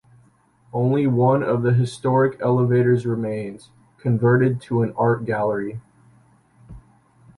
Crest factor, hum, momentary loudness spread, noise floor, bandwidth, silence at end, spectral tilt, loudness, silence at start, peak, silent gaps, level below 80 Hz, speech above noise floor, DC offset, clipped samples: 16 dB; none; 11 LU; -57 dBFS; 11 kHz; 0.6 s; -9 dB/octave; -20 LUFS; 0.75 s; -6 dBFS; none; -56 dBFS; 37 dB; under 0.1%; under 0.1%